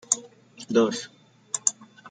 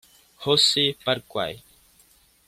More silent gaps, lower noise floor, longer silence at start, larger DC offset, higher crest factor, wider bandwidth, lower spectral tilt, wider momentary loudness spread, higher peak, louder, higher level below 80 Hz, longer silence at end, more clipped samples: neither; second, -47 dBFS vs -59 dBFS; second, 0.1 s vs 0.4 s; neither; first, 26 dB vs 20 dB; second, 10 kHz vs 16 kHz; about the same, -2.5 dB/octave vs -3 dB/octave; first, 21 LU vs 14 LU; first, -2 dBFS vs -6 dBFS; second, -26 LUFS vs -22 LUFS; second, -74 dBFS vs -62 dBFS; second, 0 s vs 0.9 s; neither